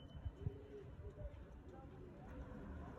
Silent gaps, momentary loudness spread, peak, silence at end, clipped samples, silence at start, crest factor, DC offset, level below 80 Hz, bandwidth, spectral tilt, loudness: none; 8 LU; -32 dBFS; 0 s; under 0.1%; 0 s; 20 dB; under 0.1%; -56 dBFS; 7.8 kHz; -8.5 dB/octave; -54 LUFS